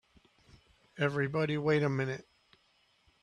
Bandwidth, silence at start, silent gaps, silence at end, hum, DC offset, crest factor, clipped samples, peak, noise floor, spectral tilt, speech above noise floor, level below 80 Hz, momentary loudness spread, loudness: 10 kHz; 0.95 s; none; 1 s; none; under 0.1%; 20 dB; under 0.1%; -16 dBFS; -70 dBFS; -7.5 dB/octave; 39 dB; -70 dBFS; 7 LU; -32 LUFS